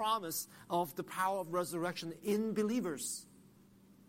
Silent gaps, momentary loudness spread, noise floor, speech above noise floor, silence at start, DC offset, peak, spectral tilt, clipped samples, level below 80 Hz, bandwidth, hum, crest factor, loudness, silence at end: none; 6 LU; -63 dBFS; 25 dB; 0 s; under 0.1%; -22 dBFS; -4 dB/octave; under 0.1%; -78 dBFS; 16.5 kHz; none; 16 dB; -37 LUFS; 0.15 s